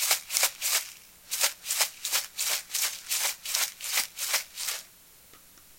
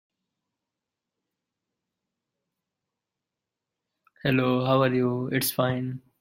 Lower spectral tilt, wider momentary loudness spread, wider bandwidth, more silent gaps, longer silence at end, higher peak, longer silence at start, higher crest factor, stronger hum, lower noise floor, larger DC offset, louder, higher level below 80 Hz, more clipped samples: second, 3.5 dB/octave vs -5.5 dB/octave; about the same, 8 LU vs 9 LU; about the same, 17 kHz vs 16.5 kHz; neither; second, 0.05 s vs 0.2 s; first, -4 dBFS vs -10 dBFS; second, 0 s vs 4.25 s; first, 28 dB vs 20 dB; neither; second, -54 dBFS vs -87 dBFS; neither; about the same, -27 LUFS vs -25 LUFS; about the same, -70 dBFS vs -66 dBFS; neither